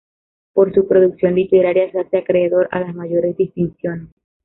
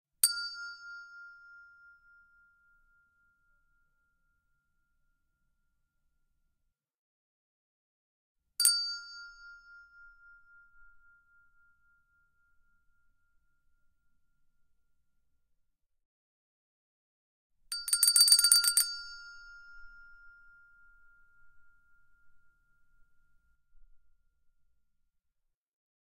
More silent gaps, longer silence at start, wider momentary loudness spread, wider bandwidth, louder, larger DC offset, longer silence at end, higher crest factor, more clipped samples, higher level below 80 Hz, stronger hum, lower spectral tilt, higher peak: second, none vs 6.98-8.35 s, 16.05-17.50 s; first, 0.55 s vs 0.25 s; second, 9 LU vs 28 LU; second, 4 kHz vs 14.5 kHz; first, -17 LUFS vs -25 LUFS; neither; second, 0.4 s vs 6.15 s; second, 14 dB vs 32 dB; neither; first, -54 dBFS vs -72 dBFS; neither; first, -12.5 dB/octave vs 6.5 dB/octave; about the same, -2 dBFS vs -4 dBFS